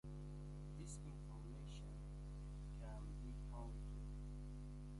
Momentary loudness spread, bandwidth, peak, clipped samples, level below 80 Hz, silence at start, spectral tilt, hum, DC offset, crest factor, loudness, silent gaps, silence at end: 2 LU; 11.5 kHz; -42 dBFS; under 0.1%; -52 dBFS; 0.05 s; -6.5 dB/octave; 50 Hz at -50 dBFS; under 0.1%; 10 dB; -54 LUFS; none; 0 s